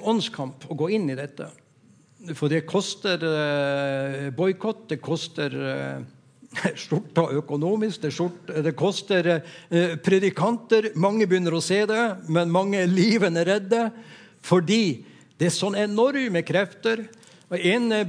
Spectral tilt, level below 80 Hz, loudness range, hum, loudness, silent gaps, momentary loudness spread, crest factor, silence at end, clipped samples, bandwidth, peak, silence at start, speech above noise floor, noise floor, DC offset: -5.5 dB/octave; -76 dBFS; 6 LU; none; -24 LUFS; none; 10 LU; 18 dB; 0 s; under 0.1%; 10.5 kHz; -6 dBFS; 0 s; 33 dB; -57 dBFS; under 0.1%